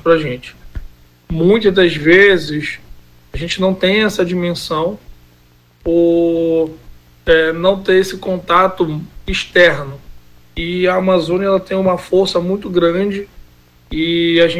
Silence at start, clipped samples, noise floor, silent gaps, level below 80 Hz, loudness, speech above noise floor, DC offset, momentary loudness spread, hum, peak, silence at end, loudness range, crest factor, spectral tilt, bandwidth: 0.05 s; under 0.1%; -49 dBFS; none; -38 dBFS; -14 LUFS; 35 dB; under 0.1%; 15 LU; 60 Hz at -45 dBFS; 0 dBFS; 0 s; 3 LU; 16 dB; -5.5 dB/octave; 15.5 kHz